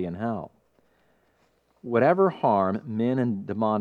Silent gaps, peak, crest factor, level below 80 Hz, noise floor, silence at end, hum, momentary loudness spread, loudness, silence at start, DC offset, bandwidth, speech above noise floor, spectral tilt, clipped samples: none; -6 dBFS; 20 dB; -68 dBFS; -66 dBFS; 0 s; none; 13 LU; -25 LUFS; 0 s; under 0.1%; 4.8 kHz; 42 dB; -9.5 dB/octave; under 0.1%